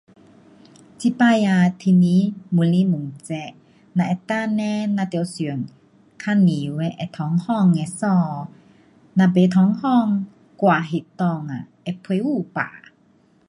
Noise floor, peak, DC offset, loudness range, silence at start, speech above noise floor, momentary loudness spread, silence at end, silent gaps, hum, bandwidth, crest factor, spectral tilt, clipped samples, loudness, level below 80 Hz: -57 dBFS; -4 dBFS; under 0.1%; 4 LU; 1 s; 38 dB; 14 LU; 0.7 s; none; none; 11 kHz; 16 dB; -7.5 dB/octave; under 0.1%; -20 LUFS; -64 dBFS